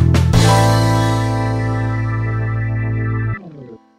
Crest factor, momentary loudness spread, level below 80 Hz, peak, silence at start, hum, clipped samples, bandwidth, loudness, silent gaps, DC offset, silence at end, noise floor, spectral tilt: 16 dB; 9 LU; -28 dBFS; 0 dBFS; 0 s; none; under 0.1%; 15 kHz; -16 LUFS; none; under 0.1%; 0.2 s; -37 dBFS; -6 dB/octave